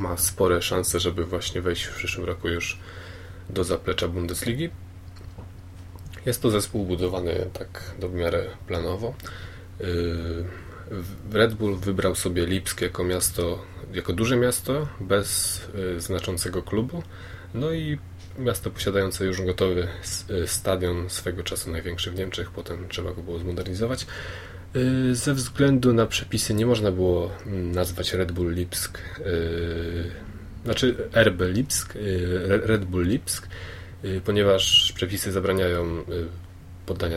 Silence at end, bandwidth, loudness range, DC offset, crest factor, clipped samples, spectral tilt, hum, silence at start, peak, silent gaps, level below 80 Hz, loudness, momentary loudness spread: 0 s; 16.5 kHz; 7 LU; under 0.1%; 24 dB; under 0.1%; -4.5 dB/octave; none; 0 s; -2 dBFS; none; -42 dBFS; -25 LUFS; 15 LU